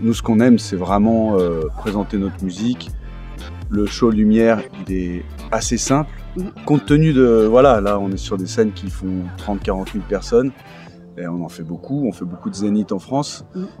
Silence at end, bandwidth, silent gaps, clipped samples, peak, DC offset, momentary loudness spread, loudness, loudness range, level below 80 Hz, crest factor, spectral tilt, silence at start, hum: 0.05 s; 13.5 kHz; none; under 0.1%; 0 dBFS; under 0.1%; 16 LU; -18 LUFS; 7 LU; -34 dBFS; 18 dB; -6 dB/octave; 0 s; none